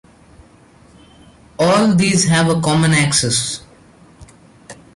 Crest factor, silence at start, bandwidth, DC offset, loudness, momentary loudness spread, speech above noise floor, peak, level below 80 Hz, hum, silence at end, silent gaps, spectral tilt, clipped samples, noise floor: 14 dB; 1.6 s; 11.5 kHz; under 0.1%; -14 LUFS; 6 LU; 33 dB; -2 dBFS; -48 dBFS; none; 0.2 s; none; -4 dB/octave; under 0.1%; -47 dBFS